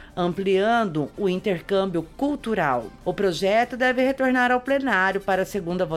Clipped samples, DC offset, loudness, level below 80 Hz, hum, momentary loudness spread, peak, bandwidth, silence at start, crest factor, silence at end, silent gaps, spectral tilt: under 0.1%; under 0.1%; -23 LUFS; -50 dBFS; none; 7 LU; -8 dBFS; 15 kHz; 0 s; 14 dB; 0 s; none; -6 dB/octave